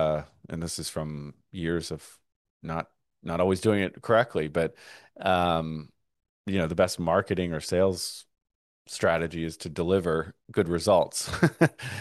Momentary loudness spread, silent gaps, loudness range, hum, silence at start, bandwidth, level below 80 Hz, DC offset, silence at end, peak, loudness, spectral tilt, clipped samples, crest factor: 15 LU; 2.36-2.60 s, 6.29-6.44 s, 8.55-8.85 s; 4 LU; none; 0 s; 12.5 kHz; -52 dBFS; under 0.1%; 0 s; -6 dBFS; -27 LUFS; -5.5 dB/octave; under 0.1%; 22 dB